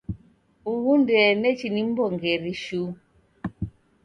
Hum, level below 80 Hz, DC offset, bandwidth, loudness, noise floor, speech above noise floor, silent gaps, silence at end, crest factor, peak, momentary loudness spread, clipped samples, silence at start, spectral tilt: none; -50 dBFS; under 0.1%; 9.6 kHz; -23 LUFS; -58 dBFS; 36 dB; none; 0.35 s; 16 dB; -8 dBFS; 19 LU; under 0.1%; 0.1 s; -6.5 dB/octave